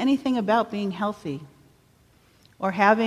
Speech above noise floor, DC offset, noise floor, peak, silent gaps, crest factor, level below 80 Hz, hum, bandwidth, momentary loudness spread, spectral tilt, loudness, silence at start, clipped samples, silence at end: 36 dB; under 0.1%; -59 dBFS; -4 dBFS; none; 20 dB; -64 dBFS; none; 13.5 kHz; 13 LU; -6.5 dB/octave; -25 LUFS; 0 s; under 0.1%; 0 s